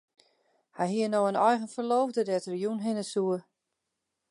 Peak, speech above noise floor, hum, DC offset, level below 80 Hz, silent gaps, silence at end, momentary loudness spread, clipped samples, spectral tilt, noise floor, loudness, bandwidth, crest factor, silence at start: -10 dBFS; 56 dB; none; under 0.1%; -84 dBFS; none; 0.9 s; 7 LU; under 0.1%; -5.5 dB/octave; -84 dBFS; -29 LUFS; 11.5 kHz; 20 dB; 0.75 s